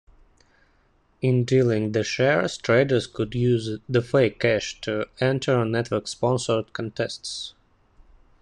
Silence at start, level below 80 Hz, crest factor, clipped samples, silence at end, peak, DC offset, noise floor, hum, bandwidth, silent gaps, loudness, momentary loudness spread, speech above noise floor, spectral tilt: 1.2 s; -54 dBFS; 18 dB; under 0.1%; 0.9 s; -6 dBFS; under 0.1%; -62 dBFS; none; 10.5 kHz; none; -24 LUFS; 8 LU; 40 dB; -6 dB/octave